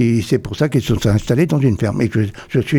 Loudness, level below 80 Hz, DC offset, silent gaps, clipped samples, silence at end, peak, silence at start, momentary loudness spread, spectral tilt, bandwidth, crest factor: -17 LUFS; -38 dBFS; under 0.1%; none; under 0.1%; 0 s; -4 dBFS; 0 s; 4 LU; -7 dB/octave; 16.5 kHz; 12 dB